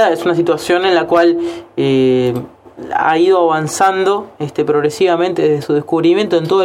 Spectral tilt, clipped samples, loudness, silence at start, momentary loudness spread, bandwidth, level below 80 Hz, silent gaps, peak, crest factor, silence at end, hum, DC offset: -5.5 dB/octave; under 0.1%; -14 LUFS; 0 s; 8 LU; 15 kHz; -54 dBFS; none; 0 dBFS; 12 dB; 0 s; none; under 0.1%